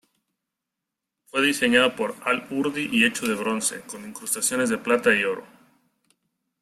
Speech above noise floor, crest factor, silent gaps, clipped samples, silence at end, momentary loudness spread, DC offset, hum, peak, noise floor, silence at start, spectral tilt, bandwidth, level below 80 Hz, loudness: 61 dB; 22 dB; none; under 0.1%; 1.15 s; 10 LU; under 0.1%; none; -4 dBFS; -85 dBFS; 1.35 s; -2.5 dB/octave; 16 kHz; -66 dBFS; -22 LUFS